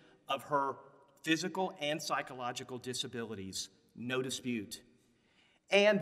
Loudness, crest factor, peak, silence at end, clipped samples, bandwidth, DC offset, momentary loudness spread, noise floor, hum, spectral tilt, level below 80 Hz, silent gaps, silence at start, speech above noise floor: -36 LUFS; 22 dB; -14 dBFS; 0 s; under 0.1%; 16 kHz; under 0.1%; 12 LU; -70 dBFS; none; -3.5 dB/octave; -80 dBFS; none; 0.3 s; 35 dB